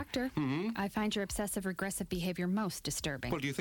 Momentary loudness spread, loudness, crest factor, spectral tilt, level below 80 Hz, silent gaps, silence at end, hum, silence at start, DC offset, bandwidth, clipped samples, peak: 2 LU; -36 LUFS; 16 dB; -4.5 dB/octave; -54 dBFS; none; 0 s; none; 0 s; under 0.1%; 18.5 kHz; under 0.1%; -20 dBFS